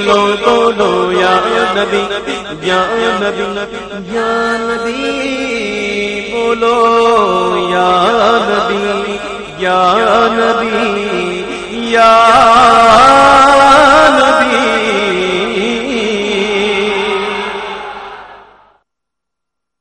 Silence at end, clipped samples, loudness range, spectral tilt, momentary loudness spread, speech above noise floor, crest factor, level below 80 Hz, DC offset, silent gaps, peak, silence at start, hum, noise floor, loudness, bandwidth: 1.45 s; 0.2%; 10 LU; -3.5 dB/octave; 13 LU; 69 dB; 12 dB; -40 dBFS; under 0.1%; none; 0 dBFS; 0 s; 50 Hz at -45 dBFS; -79 dBFS; -10 LUFS; 10.5 kHz